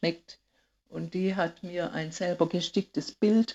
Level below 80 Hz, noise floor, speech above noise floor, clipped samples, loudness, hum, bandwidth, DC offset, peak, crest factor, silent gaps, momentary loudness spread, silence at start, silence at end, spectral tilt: -68 dBFS; -69 dBFS; 40 dB; under 0.1%; -30 LUFS; none; 8 kHz; under 0.1%; -10 dBFS; 20 dB; none; 11 LU; 0 s; 0 s; -5.5 dB/octave